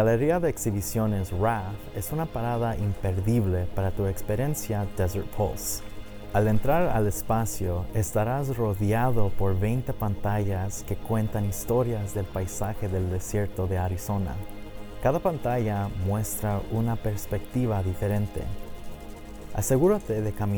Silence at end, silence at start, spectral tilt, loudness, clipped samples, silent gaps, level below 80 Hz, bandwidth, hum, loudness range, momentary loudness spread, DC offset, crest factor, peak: 0 s; 0 s; -6.5 dB/octave; -28 LUFS; under 0.1%; none; -40 dBFS; over 20 kHz; none; 3 LU; 9 LU; under 0.1%; 16 dB; -10 dBFS